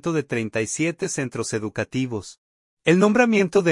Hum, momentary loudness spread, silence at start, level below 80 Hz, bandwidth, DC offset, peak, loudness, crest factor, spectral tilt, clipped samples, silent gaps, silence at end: none; 10 LU; 0.05 s; -60 dBFS; 11.5 kHz; under 0.1%; -4 dBFS; -22 LUFS; 18 dB; -5 dB/octave; under 0.1%; 2.38-2.77 s; 0 s